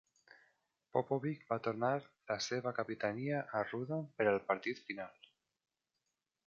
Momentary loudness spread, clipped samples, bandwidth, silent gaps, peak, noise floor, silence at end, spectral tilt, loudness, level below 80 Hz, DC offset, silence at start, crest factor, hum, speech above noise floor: 8 LU; under 0.1%; 7.6 kHz; none; -18 dBFS; -88 dBFS; 1.35 s; -4.5 dB/octave; -38 LUFS; -78 dBFS; under 0.1%; 0.95 s; 22 dB; none; 50 dB